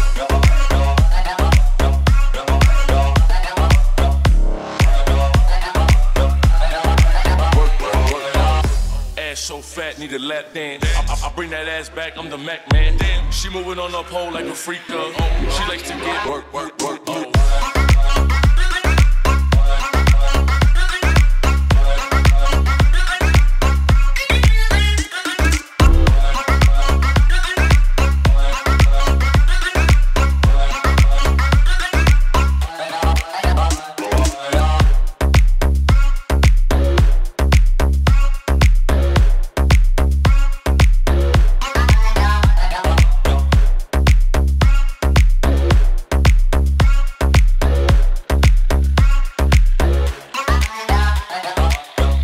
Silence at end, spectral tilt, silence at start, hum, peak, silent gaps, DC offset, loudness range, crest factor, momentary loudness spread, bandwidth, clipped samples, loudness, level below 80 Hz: 0 s; -5.5 dB/octave; 0 s; none; 0 dBFS; none; under 0.1%; 6 LU; 14 dB; 8 LU; 15 kHz; under 0.1%; -17 LUFS; -14 dBFS